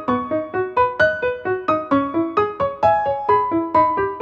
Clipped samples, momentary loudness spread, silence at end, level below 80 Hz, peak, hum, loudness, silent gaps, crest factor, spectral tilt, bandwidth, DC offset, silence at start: under 0.1%; 5 LU; 0 s; -50 dBFS; -4 dBFS; none; -19 LUFS; none; 14 dB; -7.5 dB/octave; 7.4 kHz; under 0.1%; 0 s